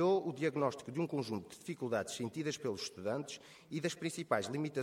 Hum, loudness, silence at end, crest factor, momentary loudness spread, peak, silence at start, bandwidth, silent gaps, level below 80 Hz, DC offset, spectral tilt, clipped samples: none; -38 LUFS; 0 s; 20 dB; 8 LU; -16 dBFS; 0 s; 16 kHz; none; -78 dBFS; under 0.1%; -5 dB/octave; under 0.1%